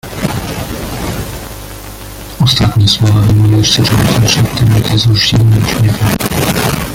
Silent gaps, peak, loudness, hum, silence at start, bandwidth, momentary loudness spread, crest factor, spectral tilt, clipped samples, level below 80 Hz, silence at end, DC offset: none; 0 dBFS; -11 LUFS; none; 0.05 s; 17 kHz; 17 LU; 10 dB; -5 dB/octave; under 0.1%; -28 dBFS; 0 s; under 0.1%